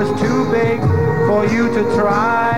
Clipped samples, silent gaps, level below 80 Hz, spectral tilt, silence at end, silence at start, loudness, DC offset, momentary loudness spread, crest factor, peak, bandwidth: under 0.1%; none; -40 dBFS; -7.5 dB/octave; 0 s; 0 s; -15 LUFS; 2%; 1 LU; 10 dB; -4 dBFS; 15.5 kHz